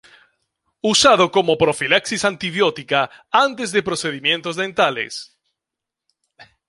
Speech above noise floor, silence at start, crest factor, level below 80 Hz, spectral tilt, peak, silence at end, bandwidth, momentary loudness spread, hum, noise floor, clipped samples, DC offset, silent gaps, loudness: 66 dB; 0.85 s; 18 dB; -56 dBFS; -3 dB/octave; -2 dBFS; 0.25 s; 11.5 kHz; 10 LU; none; -85 dBFS; under 0.1%; under 0.1%; none; -18 LUFS